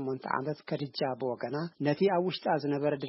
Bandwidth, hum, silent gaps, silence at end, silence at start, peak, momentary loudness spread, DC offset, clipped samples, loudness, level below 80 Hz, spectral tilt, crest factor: 5.8 kHz; none; none; 0 s; 0 s; -14 dBFS; 8 LU; under 0.1%; under 0.1%; -32 LUFS; -76 dBFS; -10 dB/octave; 18 dB